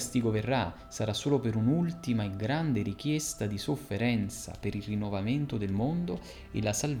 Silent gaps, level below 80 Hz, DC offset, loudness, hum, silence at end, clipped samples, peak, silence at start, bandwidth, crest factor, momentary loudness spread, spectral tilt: none; -52 dBFS; under 0.1%; -31 LUFS; none; 0 s; under 0.1%; -14 dBFS; 0 s; 18.5 kHz; 16 dB; 8 LU; -5.5 dB/octave